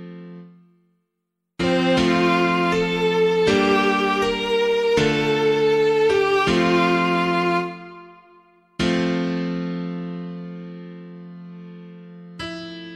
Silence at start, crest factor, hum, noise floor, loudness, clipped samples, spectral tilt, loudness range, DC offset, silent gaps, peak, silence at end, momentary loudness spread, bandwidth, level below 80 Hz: 0 s; 16 dB; none; -78 dBFS; -20 LUFS; under 0.1%; -5.5 dB/octave; 9 LU; under 0.1%; none; -6 dBFS; 0 s; 21 LU; 13 kHz; -48 dBFS